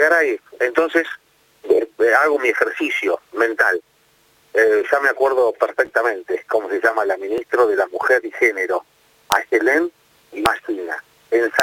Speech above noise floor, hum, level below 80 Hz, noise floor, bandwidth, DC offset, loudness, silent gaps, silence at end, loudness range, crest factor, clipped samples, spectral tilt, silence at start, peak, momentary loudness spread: 39 dB; none; -58 dBFS; -57 dBFS; 17 kHz; under 0.1%; -18 LUFS; none; 0 s; 1 LU; 18 dB; under 0.1%; -3 dB/octave; 0 s; 0 dBFS; 9 LU